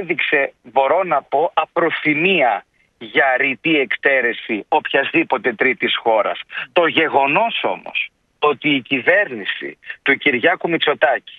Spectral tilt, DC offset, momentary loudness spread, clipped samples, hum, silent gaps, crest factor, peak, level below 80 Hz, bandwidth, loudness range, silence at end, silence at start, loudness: -7 dB/octave; under 0.1%; 8 LU; under 0.1%; none; none; 18 dB; 0 dBFS; -68 dBFS; 4.9 kHz; 1 LU; 0.1 s; 0 s; -17 LUFS